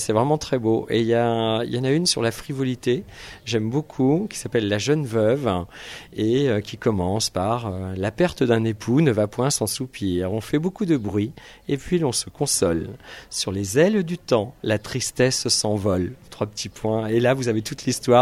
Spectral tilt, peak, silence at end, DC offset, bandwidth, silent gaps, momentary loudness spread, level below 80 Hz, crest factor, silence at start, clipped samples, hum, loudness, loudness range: -5 dB/octave; -2 dBFS; 0 s; under 0.1%; 15.5 kHz; none; 9 LU; -50 dBFS; 20 dB; 0 s; under 0.1%; none; -22 LUFS; 2 LU